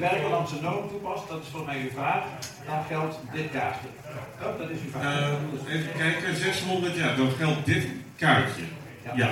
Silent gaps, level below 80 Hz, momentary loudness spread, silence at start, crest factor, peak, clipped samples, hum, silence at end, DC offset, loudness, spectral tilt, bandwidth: none; -62 dBFS; 11 LU; 0 s; 20 dB; -8 dBFS; under 0.1%; none; 0 s; under 0.1%; -28 LUFS; -5.5 dB/octave; 16.5 kHz